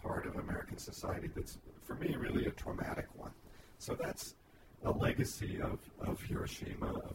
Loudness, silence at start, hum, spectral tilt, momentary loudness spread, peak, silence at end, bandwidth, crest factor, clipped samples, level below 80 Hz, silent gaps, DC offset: -41 LUFS; 0 s; none; -5.5 dB/octave; 13 LU; -20 dBFS; 0 s; 16 kHz; 20 dB; under 0.1%; -52 dBFS; none; under 0.1%